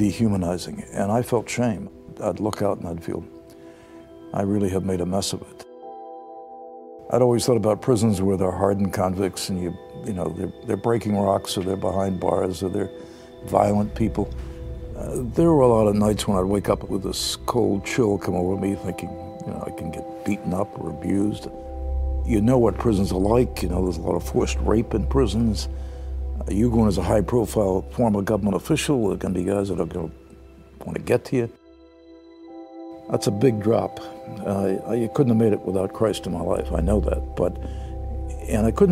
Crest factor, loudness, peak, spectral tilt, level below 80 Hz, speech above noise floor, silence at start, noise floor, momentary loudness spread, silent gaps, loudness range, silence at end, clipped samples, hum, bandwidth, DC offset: 20 dB; -23 LUFS; -2 dBFS; -6.5 dB/octave; -34 dBFS; 27 dB; 0 s; -49 dBFS; 15 LU; none; 6 LU; 0 s; under 0.1%; none; 16 kHz; under 0.1%